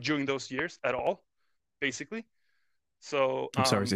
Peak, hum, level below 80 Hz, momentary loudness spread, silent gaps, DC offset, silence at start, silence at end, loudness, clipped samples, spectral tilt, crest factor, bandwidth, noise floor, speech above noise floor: -10 dBFS; none; -68 dBFS; 13 LU; none; under 0.1%; 0 s; 0 s; -31 LUFS; under 0.1%; -4.5 dB/octave; 22 dB; 16 kHz; -81 dBFS; 50 dB